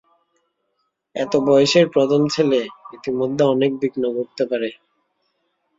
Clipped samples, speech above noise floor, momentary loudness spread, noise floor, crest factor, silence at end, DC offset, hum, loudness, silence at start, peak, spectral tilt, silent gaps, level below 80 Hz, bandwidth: under 0.1%; 54 dB; 13 LU; -72 dBFS; 18 dB; 1.05 s; under 0.1%; none; -19 LUFS; 1.15 s; -2 dBFS; -5.5 dB/octave; none; -62 dBFS; 7.8 kHz